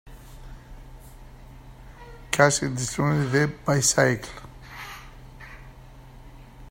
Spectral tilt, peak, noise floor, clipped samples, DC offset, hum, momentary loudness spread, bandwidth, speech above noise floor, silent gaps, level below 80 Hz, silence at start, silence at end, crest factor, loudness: -4 dB/octave; -2 dBFS; -45 dBFS; under 0.1%; under 0.1%; none; 27 LU; 16 kHz; 23 dB; none; -46 dBFS; 0.05 s; 0.05 s; 26 dB; -22 LUFS